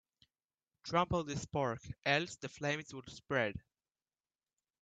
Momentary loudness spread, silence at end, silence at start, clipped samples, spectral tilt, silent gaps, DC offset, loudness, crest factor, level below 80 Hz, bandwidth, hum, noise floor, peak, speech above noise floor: 15 LU; 1.2 s; 0.85 s; under 0.1%; -4.5 dB/octave; none; under 0.1%; -37 LUFS; 24 dB; -64 dBFS; 9 kHz; none; under -90 dBFS; -16 dBFS; over 53 dB